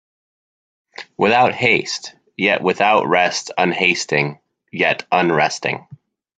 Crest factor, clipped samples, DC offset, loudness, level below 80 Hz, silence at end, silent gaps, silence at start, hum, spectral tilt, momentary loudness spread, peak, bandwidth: 18 dB; under 0.1%; under 0.1%; -17 LUFS; -62 dBFS; 0.4 s; none; 1 s; none; -4 dB/octave; 13 LU; 0 dBFS; 9.4 kHz